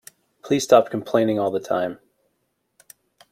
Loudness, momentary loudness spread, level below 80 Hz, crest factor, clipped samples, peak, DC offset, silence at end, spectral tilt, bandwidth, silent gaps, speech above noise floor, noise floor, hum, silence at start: -21 LUFS; 10 LU; -66 dBFS; 22 dB; under 0.1%; -2 dBFS; under 0.1%; 1.35 s; -5 dB/octave; 16 kHz; none; 53 dB; -73 dBFS; none; 0.45 s